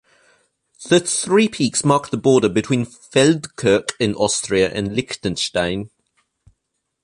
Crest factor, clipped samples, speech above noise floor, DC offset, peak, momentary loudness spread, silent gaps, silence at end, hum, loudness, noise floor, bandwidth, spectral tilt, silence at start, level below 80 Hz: 18 dB; under 0.1%; 57 dB; under 0.1%; -2 dBFS; 8 LU; none; 1.15 s; none; -18 LUFS; -75 dBFS; 11.5 kHz; -4 dB/octave; 0.8 s; -50 dBFS